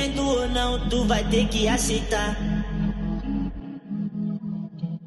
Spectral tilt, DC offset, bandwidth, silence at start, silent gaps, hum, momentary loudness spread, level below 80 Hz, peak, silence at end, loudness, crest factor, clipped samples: -4.5 dB/octave; under 0.1%; 12.5 kHz; 0 s; none; none; 10 LU; -32 dBFS; -8 dBFS; 0 s; -25 LUFS; 16 dB; under 0.1%